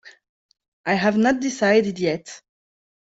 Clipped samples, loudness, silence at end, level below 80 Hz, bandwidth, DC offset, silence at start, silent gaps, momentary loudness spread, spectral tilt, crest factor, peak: under 0.1%; -21 LUFS; 0.65 s; -60 dBFS; 8 kHz; under 0.1%; 0.05 s; 0.29-0.49 s, 0.68-0.84 s; 13 LU; -5 dB/octave; 18 dB; -4 dBFS